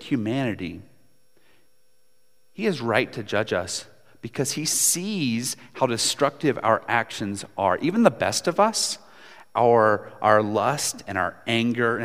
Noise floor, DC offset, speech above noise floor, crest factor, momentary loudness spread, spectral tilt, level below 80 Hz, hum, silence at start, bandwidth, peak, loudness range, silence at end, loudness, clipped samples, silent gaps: -68 dBFS; 0.2%; 45 dB; 24 dB; 11 LU; -3.5 dB/octave; -64 dBFS; none; 0 s; 15.5 kHz; 0 dBFS; 7 LU; 0 s; -23 LUFS; under 0.1%; none